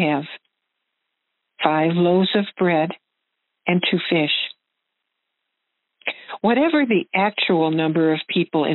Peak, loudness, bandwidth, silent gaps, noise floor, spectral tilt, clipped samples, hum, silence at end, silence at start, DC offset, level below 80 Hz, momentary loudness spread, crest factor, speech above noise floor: 0 dBFS; -20 LUFS; 4.2 kHz; none; -78 dBFS; -4 dB/octave; under 0.1%; none; 0 s; 0 s; under 0.1%; -72 dBFS; 11 LU; 20 dB; 59 dB